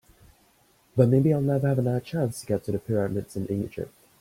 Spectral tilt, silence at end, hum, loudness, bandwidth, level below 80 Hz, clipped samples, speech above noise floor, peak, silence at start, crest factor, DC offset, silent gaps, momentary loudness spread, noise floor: -8.5 dB/octave; 0.35 s; none; -26 LUFS; 16 kHz; -58 dBFS; under 0.1%; 38 dB; -6 dBFS; 0.95 s; 20 dB; under 0.1%; none; 11 LU; -62 dBFS